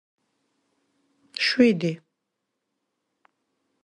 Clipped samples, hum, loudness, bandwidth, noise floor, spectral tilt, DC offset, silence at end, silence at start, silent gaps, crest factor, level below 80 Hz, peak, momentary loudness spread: under 0.1%; none; -22 LUFS; 10.5 kHz; -81 dBFS; -5.5 dB/octave; under 0.1%; 1.9 s; 1.35 s; none; 22 dB; -72 dBFS; -6 dBFS; 19 LU